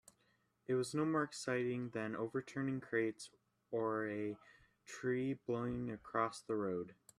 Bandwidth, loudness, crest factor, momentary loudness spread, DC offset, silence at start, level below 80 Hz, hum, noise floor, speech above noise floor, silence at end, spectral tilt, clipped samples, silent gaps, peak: 13 kHz; -40 LUFS; 20 dB; 8 LU; under 0.1%; 0.7 s; -74 dBFS; none; -78 dBFS; 38 dB; 0.25 s; -6 dB/octave; under 0.1%; none; -22 dBFS